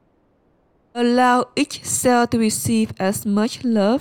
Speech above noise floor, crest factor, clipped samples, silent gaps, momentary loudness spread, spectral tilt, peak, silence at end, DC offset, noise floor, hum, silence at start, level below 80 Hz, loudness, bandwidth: 42 dB; 16 dB; under 0.1%; none; 6 LU; -4 dB/octave; -4 dBFS; 0 s; under 0.1%; -60 dBFS; none; 0.95 s; -54 dBFS; -19 LUFS; 18 kHz